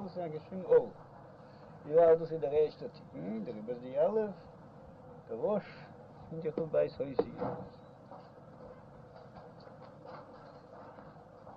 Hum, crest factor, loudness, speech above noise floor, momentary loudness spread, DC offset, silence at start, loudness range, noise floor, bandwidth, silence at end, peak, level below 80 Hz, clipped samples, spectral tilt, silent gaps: none; 20 dB; -33 LUFS; 21 dB; 25 LU; under 0.1%; 0 s; 20 LU; -53 dBFS; 5.4 kHz; 0 s; -16 dBFS; -68 dBFS; under 0.1%; -9 dB/octave; none